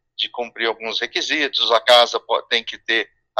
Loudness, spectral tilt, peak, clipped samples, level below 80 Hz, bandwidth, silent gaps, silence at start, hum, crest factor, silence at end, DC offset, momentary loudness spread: -18 LUFS; 0 dB/octave; 0 dBFS; under 0.1%; -68 dBFS; 15 kHz; none; 0.2 s; none; 20 dB; 0 s; under 0.1%; 11 LU